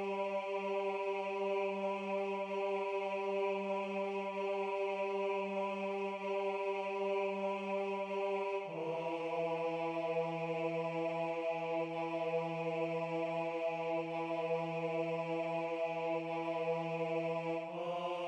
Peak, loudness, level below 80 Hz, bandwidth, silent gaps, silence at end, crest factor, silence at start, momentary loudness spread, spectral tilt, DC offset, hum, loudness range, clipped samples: -24 dBFS; -38 LUFS; -88 dBFS; 9.6 kHz; none; 0 s; 12 dB; 0 s; 2 LU; -6.5 dB/octave; under 0.1%; none; 0 LU; under 0.1%